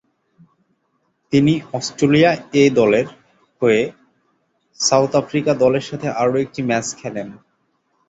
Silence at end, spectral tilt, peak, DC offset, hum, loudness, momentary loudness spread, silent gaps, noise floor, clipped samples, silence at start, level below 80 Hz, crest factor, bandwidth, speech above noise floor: 0.75 s; -5 dB/octave; -2 dBFS; under 0.1%; none; -17 LUFS; 12 LU; none; -67 dBFS; under 0.1%; 1.3 s; -56 dBFS; 18 dB; 8.4 kHz; 51 dB